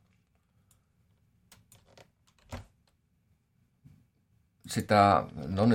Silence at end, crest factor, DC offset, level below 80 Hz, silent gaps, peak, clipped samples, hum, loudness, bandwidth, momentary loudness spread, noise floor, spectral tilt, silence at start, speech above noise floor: 0 s; 24 dB; under 0.1%; -62 dBFS; none; -8 dBFS; under 0.1%; none; -26 LUFS; 16.5 kHz; 24 LU; -71 dBFS; -6 dB/octave; 2.5 s; 46 dB